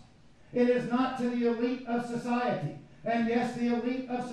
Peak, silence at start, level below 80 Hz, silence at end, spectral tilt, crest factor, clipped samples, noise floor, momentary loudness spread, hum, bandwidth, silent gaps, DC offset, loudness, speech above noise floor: -14 dBFS; 0.5 s; -64 dBFS; 0 s; -6.5 dB/octave; 16 dB; under 0.1%; -57 dBFS; 7 LU; none; 10.5 kHz; none; 0.1%; -30 LUFS; 28 dB